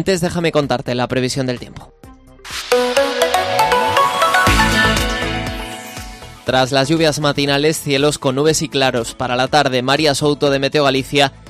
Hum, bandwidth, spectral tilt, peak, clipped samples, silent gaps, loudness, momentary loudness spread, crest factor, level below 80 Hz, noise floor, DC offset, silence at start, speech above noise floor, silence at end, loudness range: none; 15.5 kHz; -4 dB/octave; 0 dBFS; under 0.1%; none; -15 LUFS; 13 LU; 16 dB; -34 dBFS; -40 dBFS; under 0.1%; 0 s; 24 dB; 0 s; 3 LU